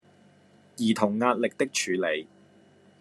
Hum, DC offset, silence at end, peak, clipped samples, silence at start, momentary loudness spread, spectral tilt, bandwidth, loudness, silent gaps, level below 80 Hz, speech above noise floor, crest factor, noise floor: none; under 0.1%; 0.75 s; -8 dBFS; under 0.1%; 0.8 s; 7 LU; -4 dB/octave; 12.5 kHz; -27 LUFS; none; -76 dBFS; 32 dB; 22 dB; -58 dBFS